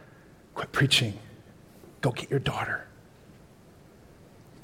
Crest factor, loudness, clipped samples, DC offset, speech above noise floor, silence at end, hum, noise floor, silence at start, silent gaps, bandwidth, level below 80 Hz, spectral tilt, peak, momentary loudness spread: 22 dB; -28 LUFS; under 0.1%; under 0.1%; 27 dB; 1.3 s; none; -54 dBFS; 0 s; none; 16.5 kHz; -58 dBFS; -4 dB/octave; -10 dBFS; 21 LU